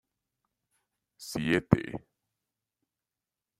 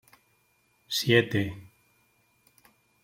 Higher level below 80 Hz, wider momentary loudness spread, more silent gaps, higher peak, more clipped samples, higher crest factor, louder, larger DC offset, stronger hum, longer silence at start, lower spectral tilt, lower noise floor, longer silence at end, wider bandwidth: first, -58 dBFS vs -64 dBFS; first, 18 LU vs 14 LU; neither; first, -4 dBFS vs -8 dBFS; neither; first, 30 dB vs 24 dB; second, -29 LUFS vs -26 LUFS; neither; neither; first, 1.2 s vs 0.9 s; first, -6.5 dB/octave vs -4.5 dB/octave; first, -90 dBFS vs -69 dBFS; first, 1.6 s vs 1.4 s; about the same, 16 kHz vs 16.5 kHz